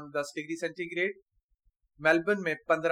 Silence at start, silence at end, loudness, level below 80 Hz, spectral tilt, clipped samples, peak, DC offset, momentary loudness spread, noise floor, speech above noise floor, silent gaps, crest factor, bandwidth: 0 s; 0 s; -30 LUFS; -70 dBFS; -5 dB/octave; under 0.1%; -10 dBFS; under 0.1%; 9 LU; -72 dBFS; 43 dB; 1.22-1.26 s, 1.43-1.49 s; 22 dB; 15 kHz